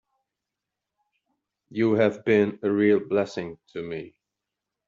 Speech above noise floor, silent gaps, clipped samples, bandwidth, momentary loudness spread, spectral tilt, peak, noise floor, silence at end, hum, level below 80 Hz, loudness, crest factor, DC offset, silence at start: 62 dB; none; under 0.1%; 7.4 kHz; 15 LU; -6 dB/octave; -8 dBFS; -86 dBFS; 0.8 s; none; -68 dBFS; -24 LUFS; 20 dB; under 0.1%; 1.7 s